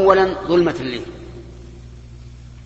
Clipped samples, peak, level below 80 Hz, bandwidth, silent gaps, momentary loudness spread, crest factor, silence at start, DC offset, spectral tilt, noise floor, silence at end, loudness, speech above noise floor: under 0.1%; 0 dBFS; -40 dBFS; 8 kHz; none; 24 LU; 20 dB; 0 s; under 0.1%; -6.5 dB/octave; -38 dBFS; 0 s; -18 LUFS; 21 dB